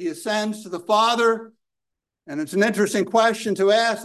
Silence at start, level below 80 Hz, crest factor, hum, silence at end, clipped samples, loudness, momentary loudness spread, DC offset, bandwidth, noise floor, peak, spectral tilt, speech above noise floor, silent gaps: 0 s; -72 dBFS; 16 dB; none; 0 s; under 0.1%; -21 LUFS; 11 LU; under 0.1%; 12.5 kHz; -84 dBFS; -6 dBFS; -4 dB/octave; 63 dB; none